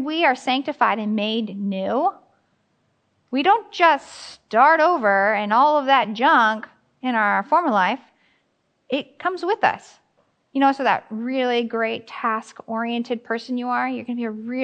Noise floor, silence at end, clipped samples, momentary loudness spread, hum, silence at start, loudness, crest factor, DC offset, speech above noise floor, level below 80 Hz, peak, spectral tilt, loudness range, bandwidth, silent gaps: -68 dBFS; 0 s; under 0.1%; 11 LU; none; 0 s; -21 LUFS; 20 dB; under 0.1%; 48 dB; -76 dBFS; -2 dBFS; -5 dB/octave; 7 LU; 9.2 kHz; none